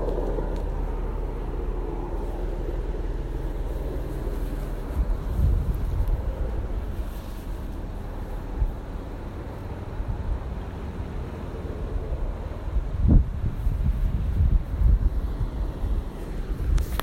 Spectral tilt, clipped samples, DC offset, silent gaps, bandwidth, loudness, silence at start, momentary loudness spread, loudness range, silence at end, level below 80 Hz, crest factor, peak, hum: -8 dB/octave; under 0.1%; under 0.1%; none; 15 kHz; -30 LUFS; 0 s; 11 LU; 8 LU; 0 s; -26 dBFS; 20 dB; -6 dBFS; none